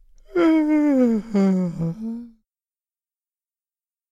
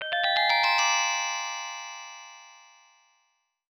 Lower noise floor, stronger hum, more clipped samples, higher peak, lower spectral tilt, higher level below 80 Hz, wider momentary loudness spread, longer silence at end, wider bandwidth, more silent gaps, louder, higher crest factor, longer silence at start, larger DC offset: first, under -90 dBFS vs -74 dBFS; neither; neither; about the same, -8 dBFS vs -10 dBFS; first, -8.5 dB/octave vs 4 dB/octave; first, -54 dBFS vs -82 dBFS; second, 13 LU vs 20 LU; first, 1.85 s vs 1.15 s; second, 7.6 kHz vs 18.5 kHz; neither; first, -20 LUFS vs -24 LUFS; about the same, 16 dB vs 18 dB; first, 0.35 s vs 0 s; neither